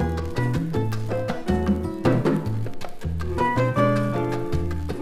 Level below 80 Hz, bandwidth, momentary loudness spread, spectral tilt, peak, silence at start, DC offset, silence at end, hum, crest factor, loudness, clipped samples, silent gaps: -36 dBFS; 14.5 kHz; 9 LU; -8 dB/octave; -6 dBFS; 0 s; under 0.1%; 0 s; none; 18 dB; -24 LUFS; under 0.1%; none